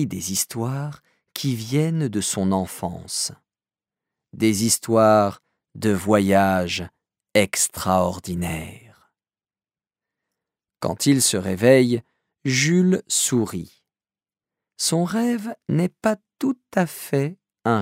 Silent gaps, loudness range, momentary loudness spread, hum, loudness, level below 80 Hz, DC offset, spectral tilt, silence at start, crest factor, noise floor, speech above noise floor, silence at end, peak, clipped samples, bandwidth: none; 6 LU; 12 LU; none; -21 LUFS; -56 dBFS; under 0.1%; -4.5 dB/octave; 0 s; 20 dB; under -90 dBFS; over 69 dB; 0 s; -2 dBFS; under 0.1%; 16 kHz